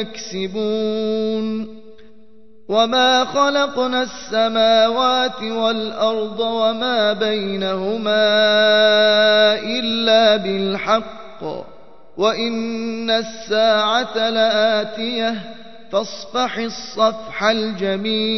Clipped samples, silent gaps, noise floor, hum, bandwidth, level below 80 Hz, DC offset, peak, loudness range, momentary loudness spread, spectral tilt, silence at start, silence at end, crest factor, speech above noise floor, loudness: under 0.1%; none; -50 dBFS; none; 6.2 kHz; -58 dBFS; 1%; -2 dBFS; 6 LU; 11 LU; -4 dB/octave; 0 s; 0 s; 16 dB; 32 dB; -18 LUFS